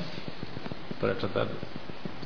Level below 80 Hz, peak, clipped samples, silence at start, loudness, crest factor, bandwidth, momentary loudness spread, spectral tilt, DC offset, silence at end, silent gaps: -58 dBFS; -16 dBFS; under 0.1%; 0 s; -35 LUFS; 18 dB; 5.4 kHz; 10 LU; -7 dB/octave; 2%; 0 s; none